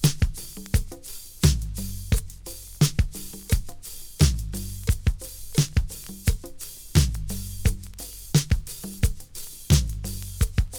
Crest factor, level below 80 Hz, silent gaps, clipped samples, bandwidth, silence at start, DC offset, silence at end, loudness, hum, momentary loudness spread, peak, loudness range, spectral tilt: 22 dB; -30 dBFS; none; under 0.1%; over 20 kHz; 0 s; under 0.1%; 0 s; -26 LUFS; none; 15 LU; -4 dBFS; 1 LU; -4.5 dB/octave